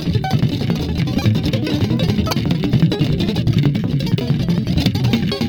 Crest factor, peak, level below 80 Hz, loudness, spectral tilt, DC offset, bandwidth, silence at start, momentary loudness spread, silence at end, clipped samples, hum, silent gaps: 16 dB; 0 dBFS; -32 dBFS; -18 LUFS; -7 dB/octave; under 0.1%; 18.5 kHz; 0 s; 3 LU; 0 s; under 0.1%; none; none